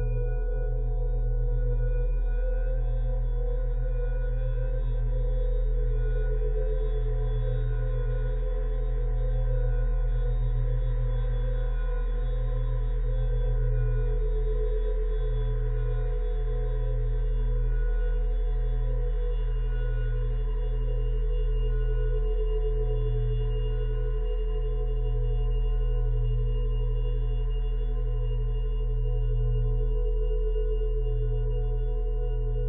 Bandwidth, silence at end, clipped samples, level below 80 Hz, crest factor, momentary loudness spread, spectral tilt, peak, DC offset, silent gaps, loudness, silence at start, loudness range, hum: 3.6 kHz; 0 s; under 0.1%; -26 dBFS; 8 dB; 2 LU; -11.5 dB/octave; -18 dBFS; under 0.1%; none; -31 LUFS; 0 s; 1 LU; none